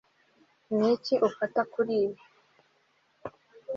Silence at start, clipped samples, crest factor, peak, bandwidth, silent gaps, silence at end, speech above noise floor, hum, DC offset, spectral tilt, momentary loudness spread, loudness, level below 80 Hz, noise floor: 0.7 s; under 0.1%; 18 dB; -12 dBFS; 7.4 kHz; none; 0 s; 42 dB; none; under 0.1%; -6.5 dB/octave; 20 LU; -28 LUFS; -74 dBFS; -69 dBFS